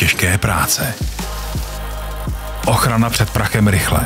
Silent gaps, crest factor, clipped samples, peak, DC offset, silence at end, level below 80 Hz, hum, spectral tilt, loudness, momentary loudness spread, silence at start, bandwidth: none; 14 dB; under 0.1%; -2 dBFS; under 0.1%; 0 s; -26 dBFS; none; -4 dB/octave; -17 LUFS; 11 LU; 0 s; 16.5 kHz